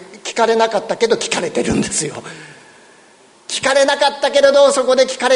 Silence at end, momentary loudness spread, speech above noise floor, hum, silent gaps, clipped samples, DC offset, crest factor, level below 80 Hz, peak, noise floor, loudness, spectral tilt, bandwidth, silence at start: 0 s; 13 LU; 33 dB; none; none; under 0.1%; under 0.1%; 16 dB; -48 dBFS; 0 dBFS; -47 dBFS; -15 LUFS; -2.5 dB/octave; 11 kHz; 0 s